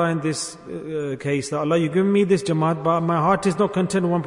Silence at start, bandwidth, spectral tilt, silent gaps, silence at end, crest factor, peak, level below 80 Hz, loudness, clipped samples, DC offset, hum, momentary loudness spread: 0 s; 11 kHz; -6 dB/octave; none; 0 s; 14 dB; -6 dBFS; -58 dBFS; -21 LUFS; under 0.1%; under 0.1%; none; 9 LU